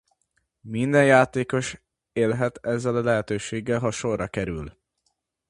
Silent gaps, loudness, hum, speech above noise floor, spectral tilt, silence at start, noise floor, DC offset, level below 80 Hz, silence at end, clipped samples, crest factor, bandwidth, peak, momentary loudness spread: none; -24 LUFS; none; 51 dB; -6 dB/octave; 0.65 s; -75 dBFS; under 0.1%; -52 dBFS; 0.8 s; under 0.1%; 22 dB; 11.5 kHz; -2 dBFS; 16 LU